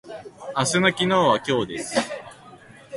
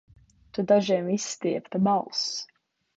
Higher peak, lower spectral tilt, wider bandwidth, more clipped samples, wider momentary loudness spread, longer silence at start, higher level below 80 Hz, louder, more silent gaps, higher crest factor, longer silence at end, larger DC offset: first, -4 dBFS vs -8 dBFS; about the same, -4 dB/octave vs -5 dB/octave; first, 11.5 kHz vs 8 kHz; neither; first, 17 LU vs 13 LU; second, 0.05 s vs 0.55 s; first, -58 dBFS vs -66 dBFS; first, -22 LUFS vs -26 LUFS; neither; about the same, 20 dB vs 18 dB; second, 0 s vs 0.5 s; neither